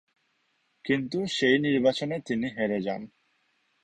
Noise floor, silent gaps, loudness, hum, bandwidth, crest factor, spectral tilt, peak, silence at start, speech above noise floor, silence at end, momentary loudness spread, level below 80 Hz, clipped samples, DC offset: -72 dBFS; none; -27 LUFS; none; 10 kHz; 18 dB; -5.5 dB/octave; -10 dBFS; 0.85 s; 46 dB; 0.8 s; 13 LU; -66 dBFS; under 0.1%; under 0.1%